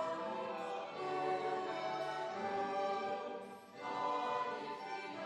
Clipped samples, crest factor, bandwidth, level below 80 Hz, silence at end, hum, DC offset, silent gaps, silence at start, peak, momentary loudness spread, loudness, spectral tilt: under 0.1%; 14 dB; 12 kHz; -84 dBFS; 0 s; none; under 0.1%; none; 0 s; -26 dBFS; 7 LU; -40 LUFS; -4.5 dB/octave